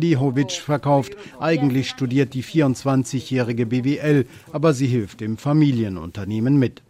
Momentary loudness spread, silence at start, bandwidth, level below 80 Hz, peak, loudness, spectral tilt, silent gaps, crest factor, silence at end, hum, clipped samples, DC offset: 8 LU; 0 s; 14 kHz; -56 dBFS; -6 dBFS; -21 LUFS; -7 dB/octave; none; 14 dB; 0.2 s; none; under 0.1%; under 0.1%